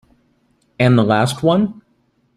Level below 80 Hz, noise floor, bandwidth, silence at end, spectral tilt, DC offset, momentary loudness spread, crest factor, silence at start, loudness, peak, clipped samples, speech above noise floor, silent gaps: -52 dBFS; -61 dBFS; 13 kHz; 0.65 s; -6.5 dB/octave; under 0.1%; 5 LU; 16 dB; 0.8 s; -16 LUFS; -2 dBFS; under 0.1%; 47 dB; none